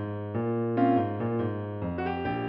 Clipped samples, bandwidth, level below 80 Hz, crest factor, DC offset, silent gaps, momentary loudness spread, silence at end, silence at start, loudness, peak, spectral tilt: under 0.1%; 5.4 kHz; -56 dBFS; 16 dB; under 0.1%; none; 9 LU; 0 s; 0 s; -29 LUFS; -12 dBFS; -7.5 dB/octave